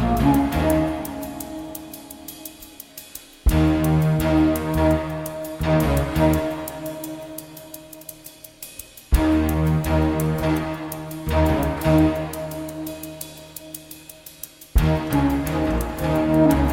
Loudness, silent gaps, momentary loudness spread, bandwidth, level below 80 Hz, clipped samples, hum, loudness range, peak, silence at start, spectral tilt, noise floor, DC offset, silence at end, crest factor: -22 LUFS; none; 19 LU; 17 kHz; -30 dBFS; under 0.1%; none; 6 LU; -6 dBFS; 0 s; -6.5 dB/octave; -43 dBFS; under 0.1%; 0 s; 16 dB